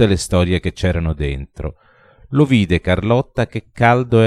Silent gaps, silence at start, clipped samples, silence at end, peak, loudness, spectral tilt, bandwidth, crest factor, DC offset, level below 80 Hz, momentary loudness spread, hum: none; 0 s; under 0.1%; 0 s; 0 dBFS; -17 LUFS; -6.5 dB/octave; 13 kHz; 16 dB; under 0.1%; -32 dBFS; 11 LU; none